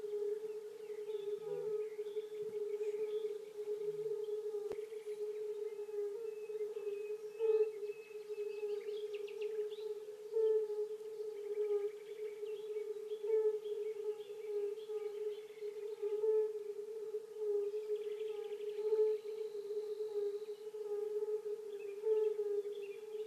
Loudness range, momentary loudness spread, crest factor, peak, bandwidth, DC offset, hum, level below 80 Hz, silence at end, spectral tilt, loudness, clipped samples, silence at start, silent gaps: 3 LU; 10 LU; 16 dB; -24 dBFS; 14 kHz; under 0.1%; none; under -90 dBFS; 0 s; -4.5 dB/octave; -41 LUFS; under 0.1%; 0 s; none